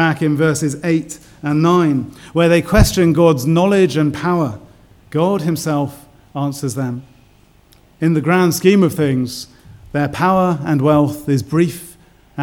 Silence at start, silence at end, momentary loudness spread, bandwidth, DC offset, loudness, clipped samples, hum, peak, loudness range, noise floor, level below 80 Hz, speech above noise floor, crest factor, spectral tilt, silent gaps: 0 s; 0 s; 12 LU; 17.5 kHz; under 0.1%; -16 LUFS; under 0.1%; none; 0 dBFS; 7 LU; -50 dBFS; -32 dBFS; 35 dB; 16 dB; -6.5 dB/octave; none